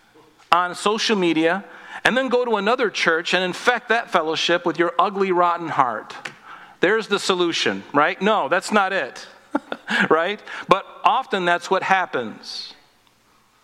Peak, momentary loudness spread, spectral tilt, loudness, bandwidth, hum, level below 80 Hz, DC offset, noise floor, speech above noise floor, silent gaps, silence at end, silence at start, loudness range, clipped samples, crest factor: 0 dBFS; 12 LU; -3.5 dB/octave; -20 LUFS; 15 kHz; none; -64 dBFS; under 0.1%; -58 dBFS; 38 dB; none; 0.9 s; 0.5 s; 2 LU; under 0.1%; 20 dB